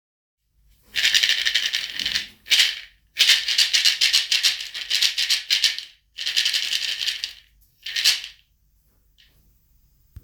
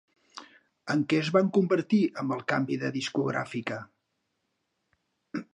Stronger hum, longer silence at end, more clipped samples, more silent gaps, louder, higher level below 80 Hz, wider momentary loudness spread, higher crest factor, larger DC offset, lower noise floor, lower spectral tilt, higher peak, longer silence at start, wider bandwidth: neither; first, 1.9 s vs 0.1 s; neither; neither; first, -19 LUFS vs -28 LUFS; first, -60 dBFS vs -76 dBFS; second, 13 LU vs 21 LU; about the same, 22 dB vs 20 dB; neither; second, -62 dBFS vs -79 dBFS; second, 3.5 dB/octave vs -6.5 dB/octave; first, -2 dBFS vs -10 dBFS; first, 0.95 s vs 0.35 s; first, over 20 kHz vs 10.5 kHz